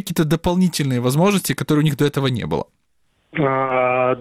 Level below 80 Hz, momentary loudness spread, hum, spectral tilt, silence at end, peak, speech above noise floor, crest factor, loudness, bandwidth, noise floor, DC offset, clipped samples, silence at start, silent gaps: -44 dBFS; 7 LU; none; -6 dB/octave; 0 s; -6 dBFS; 47 dB; 12 dB; -19 LUFS; 16.5 kHz; -65 dBFS; under 0.1%; under 0.1%; 0.05 s; none